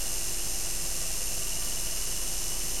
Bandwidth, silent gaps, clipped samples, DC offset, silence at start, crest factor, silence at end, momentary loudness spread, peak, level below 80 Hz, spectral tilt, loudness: 16.5 kHz; none; under 0.1%; 3%; 0 s; 14 dB; 0 s; 0 LU; -18 dBFS; -42 dBFS; -0.5 dB/octave; -30 LUFS